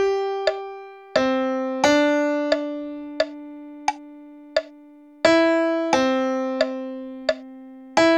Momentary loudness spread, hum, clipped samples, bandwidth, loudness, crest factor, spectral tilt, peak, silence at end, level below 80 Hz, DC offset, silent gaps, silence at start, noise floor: 17 LU; none; under 0.1%; 12.5 kHz; -22 LUFS; 22 dB; -3.5 dB/octave; -2 dBFS; 0 s; -60 dBFS; under 0.1%; none; 0 s; -47 dBFS